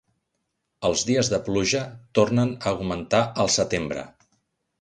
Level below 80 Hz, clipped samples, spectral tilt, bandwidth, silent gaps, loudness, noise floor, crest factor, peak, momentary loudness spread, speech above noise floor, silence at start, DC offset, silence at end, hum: -50 dBFS; under 0.1%; -4 dB/octave; 11 kHz; none; -23 LUFS; -77 dBFS; 18 dB; -6 dBFS; 6 LU; 54 dB; 0.8 s; under 0.1%; 0.7 s; none